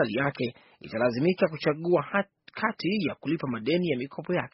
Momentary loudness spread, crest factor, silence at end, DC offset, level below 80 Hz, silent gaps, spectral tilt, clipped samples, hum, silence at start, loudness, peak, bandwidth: 8 LU; 18 dB; 0.05 s; under 0.1%; -66 dBFS; none; -5 dB/octave; under 0.1%; none; 0 s; -28 LUFS; -8 dBFS; 5.8 kHz